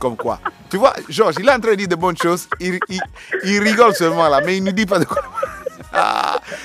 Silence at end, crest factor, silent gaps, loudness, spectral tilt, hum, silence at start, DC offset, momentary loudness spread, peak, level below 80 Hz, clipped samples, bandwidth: 0 s; 18 dB; none; -17 LUFS; -4.5 dB/octave; none; 0 s; under 0.1%; 12 LU; 0 dBFS; -48 dBFS; under 0.1%; 15.5 kHz